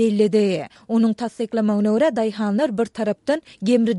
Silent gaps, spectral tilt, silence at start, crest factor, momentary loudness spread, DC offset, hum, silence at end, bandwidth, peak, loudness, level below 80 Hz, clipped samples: none; -7 dB/octave; 0 s; 14 dB; 7 LU; under 0.1%; none; 0 s; 11 kHz; -6 dBFS; -21 LUFS; -64 dBFS; under 0.1%